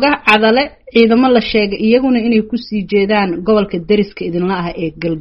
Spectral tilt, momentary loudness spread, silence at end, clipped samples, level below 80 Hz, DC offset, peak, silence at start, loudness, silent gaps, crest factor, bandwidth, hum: -4 dB/octave; 9 LU; 0 s; under 0.1%; -42 dBFS; under 0.1%; 0 dBFS; 0 s; -13 LUFS; none; 14 dB; 6 kHz; none